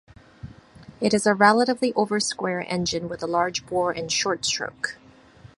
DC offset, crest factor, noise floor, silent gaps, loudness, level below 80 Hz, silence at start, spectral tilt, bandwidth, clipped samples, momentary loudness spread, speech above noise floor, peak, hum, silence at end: under 0.1%; 22 dB; -49 dBFS; none; -23 LUFS; -56 dBFS; 0.45 s; -3.5 dB/octave; 11.5 kHz; under 0.1%; 12 LU; 26 dB; -2 dBFS; none; 0.1 s